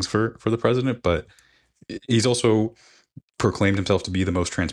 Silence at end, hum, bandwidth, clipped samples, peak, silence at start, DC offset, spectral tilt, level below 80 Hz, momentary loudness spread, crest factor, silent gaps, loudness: 0 s; none; 11.5 kHz; under 0.1%; -4 dBFS; 0 s; under 0.1%; -5.5 dB/octave; -46 dBFS; 7 LU; 18 dB; 3.23-3.28 s; -22 LUFS